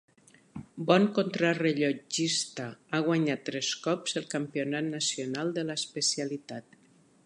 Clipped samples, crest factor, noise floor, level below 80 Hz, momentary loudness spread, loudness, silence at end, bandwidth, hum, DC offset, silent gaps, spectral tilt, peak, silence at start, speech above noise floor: under 0.1%; 22 dB; -62 dBFS; -74 dBFS; 13 LU; -29 LUFS; 0.65 s; 11.5 kHz; none; under 0.1%; none; -4 dB/octave; -10 dBFS; 0.55 s; 32 dB